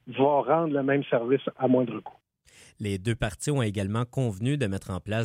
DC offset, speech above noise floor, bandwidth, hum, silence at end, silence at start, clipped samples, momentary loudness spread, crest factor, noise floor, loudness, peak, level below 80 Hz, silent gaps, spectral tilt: under 0.1%; 30 dB; 15.5 kHz; none; 0 s; 0.05 s; under 0.1%; 8 LU; 16 dB; -57 dBFS; -27 LUFS; -10 dBFS; -54 dBFS; none; -6.5 dB/octave